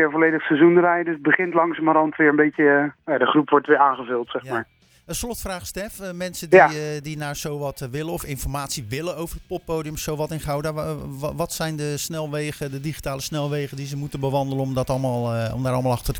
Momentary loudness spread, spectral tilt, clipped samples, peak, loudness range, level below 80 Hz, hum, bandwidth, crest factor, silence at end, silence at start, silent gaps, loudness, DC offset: 13 LU; -5.5 dB/octave; under 0.1%; 0 dBFS; 9 LU; -44 dBFS; none; over 20 kHz; 22 dB; 0 s; 0 s; none; -22 LUFS; under 0.1%